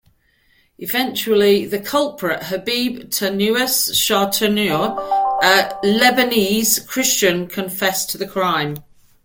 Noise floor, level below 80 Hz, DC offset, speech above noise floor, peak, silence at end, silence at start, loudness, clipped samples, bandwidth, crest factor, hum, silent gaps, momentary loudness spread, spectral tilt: -58 dBFS; -54 dBFS; under 0.1%; 41 dB; -2 dBFS; 0.45 s; 0.8 s; -17 LUFS; under 0.1%; 17 kHz; 18 dB; none; none; 8 LU; -2.5 dB/octave